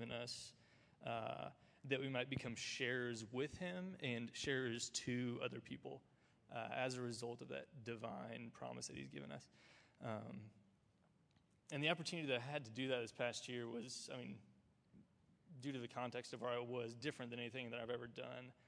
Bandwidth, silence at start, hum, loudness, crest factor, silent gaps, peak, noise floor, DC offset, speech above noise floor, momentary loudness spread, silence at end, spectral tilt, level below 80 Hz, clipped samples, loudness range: 11 kHz; 0 s; none; -47 LUFS; 24 dB; none; -24 dBFS; -76 dBFS; under 0.1%; 30 dB; 12 LU; 0.15 s; -4 dB/octave; -80 dBFS; under 0.1%; 7 LU